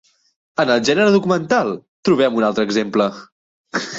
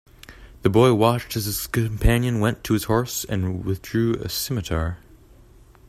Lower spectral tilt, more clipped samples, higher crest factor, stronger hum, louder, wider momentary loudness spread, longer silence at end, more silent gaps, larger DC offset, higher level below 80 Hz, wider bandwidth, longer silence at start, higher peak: about the same, -5 dB/octave vs -5.5 dB/octave; neither; about the same, 16 dB vs 20 dB; neither; first, -17 LUFS vs -22 LUFS; about the same, 10 LU vs 9 LU; second, 0 s vs 0.95 s; first, 1.88-2.03 s, 3.32-3.64 s vs none; neither; second, -60 dBFS vs -34 dBFS; second, 8 kHz vs 15 kHz; first, 0.6 s vs 0.3 s; about the same, -2 dBFS vs -2 dBFS